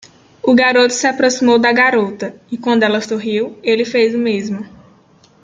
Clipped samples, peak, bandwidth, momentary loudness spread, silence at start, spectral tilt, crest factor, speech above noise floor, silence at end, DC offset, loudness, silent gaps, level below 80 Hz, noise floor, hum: under 0.1%; -2 dBFS; 9.2 kHz; 13 LU; 0.45 s; -3.5 dB/octave; 14 dB; 35 dB; 0.75 s; under 0.1%; -14 LUFS; none; -60 dBFS; -49 dBFS; none